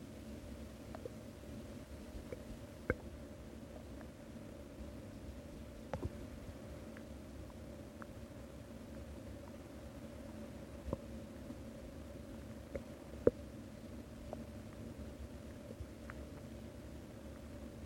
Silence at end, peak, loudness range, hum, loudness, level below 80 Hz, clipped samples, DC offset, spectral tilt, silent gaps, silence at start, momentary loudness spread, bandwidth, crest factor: 0 s; -14 dBFS; 7 LU; none; -49 LUFS; -56 dBFS; under 0.1%; under 0.1%; -6.5 dB/octave; none; 0 s; 7 LU; 16.5 kHz; 34 dB